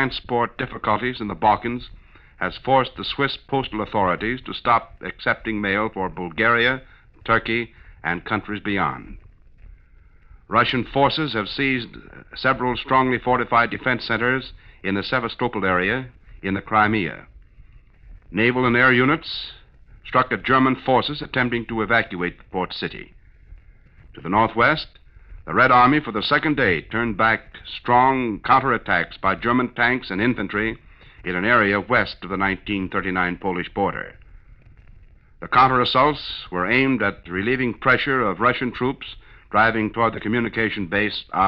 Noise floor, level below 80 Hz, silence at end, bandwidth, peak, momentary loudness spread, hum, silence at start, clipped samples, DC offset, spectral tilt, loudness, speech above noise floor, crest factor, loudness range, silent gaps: -50 dBFS; -46 dBFS; 0 s; 5.8 kHz; -4 dBFS; 12 LU; none; 0 s; under 0.1%; under 0.1%; -8 dB/octave; -21 LUFS; 29 dB; 18 dB; 5 LU; none